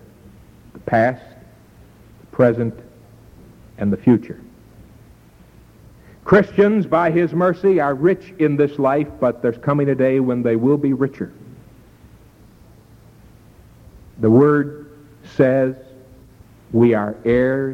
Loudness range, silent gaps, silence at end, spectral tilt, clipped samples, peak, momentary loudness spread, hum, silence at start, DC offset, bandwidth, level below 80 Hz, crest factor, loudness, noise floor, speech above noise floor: 7 LU; none; 0 s; -9.5 dB/octave; under 0.1%; -2 dBFS; 14 LU; none; 0.75 s; under 0.1%; 9 kHz; -50 dBFS; 16 dB; -17 LUFS; -47 dBFS; 31 dB